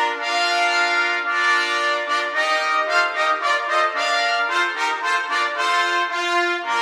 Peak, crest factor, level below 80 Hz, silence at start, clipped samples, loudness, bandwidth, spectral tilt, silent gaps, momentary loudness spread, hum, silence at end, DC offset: -6 dBFS; 14 dB; -80 dBFS; 0 s; under 0.1%; -19 LUFS; 15.5 kHz; 2 dB/octave; none; 3 LU; none; 0 s; under 0.1%